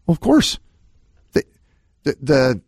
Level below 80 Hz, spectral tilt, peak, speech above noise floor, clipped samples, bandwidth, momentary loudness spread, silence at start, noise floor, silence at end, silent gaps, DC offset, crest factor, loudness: -42 dBFS; -5.5 dB/octave; -2 dBFS; 42 dB; under 0.1%; 15.5 kHz; 11 LU; 0.1 s; -59 dBFS; 0.1 s; none; under 0.1%; 18 dB; -19 LUFS